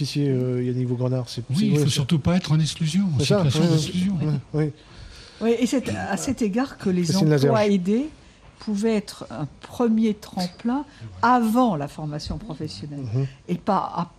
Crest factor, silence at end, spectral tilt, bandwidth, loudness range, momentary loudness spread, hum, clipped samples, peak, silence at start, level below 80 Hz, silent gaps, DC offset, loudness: 16 dB; 0.1 s; -6.5 dB/octave; 14.5 kHz; 3 LU; 13 LU; none; under 0.1%; -6 dBFS; 0 s; -50 dBFS; none; under 0.1%; -23 LUFS